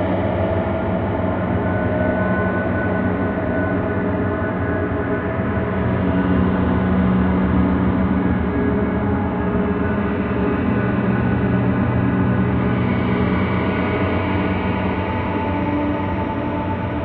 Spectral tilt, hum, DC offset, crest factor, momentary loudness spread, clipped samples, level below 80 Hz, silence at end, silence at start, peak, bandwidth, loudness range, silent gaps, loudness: -11.5 dB/octave; none; under 0.1%; 14 dB; 4 LU; under 0.1%; -32 dBFS; 0 s; 0 s; -6 dBFS; 4.5 kHz; 2 LU; none; -20 LUFS